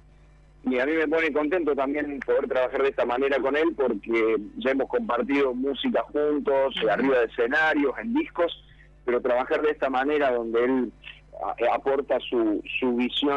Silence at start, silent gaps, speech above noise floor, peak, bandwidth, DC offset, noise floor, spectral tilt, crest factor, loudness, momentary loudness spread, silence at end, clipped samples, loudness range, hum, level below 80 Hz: 0.65 s; none; 29 dB; -12 dBFS; 7.6 kHz; under 0.1%; -53 dBFS; -6 dB/octave; 12 dB; -25 LUFS; 5 LU; 0 s; under 0.1%; 2 LU; none; -54 dBFS